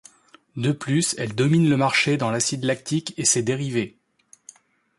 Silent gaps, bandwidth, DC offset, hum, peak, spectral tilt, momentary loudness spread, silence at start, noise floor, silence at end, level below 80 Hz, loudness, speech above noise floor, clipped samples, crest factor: none; 11.5 kHz; under 0.1%; none; -6 dBFS; -4 dB/octave; 9 LU; 0.55 s; -57 dBFS; 1.1 s; -62 dBFS; -22 LUFS; 35 dB; under 0.1%; 18 dB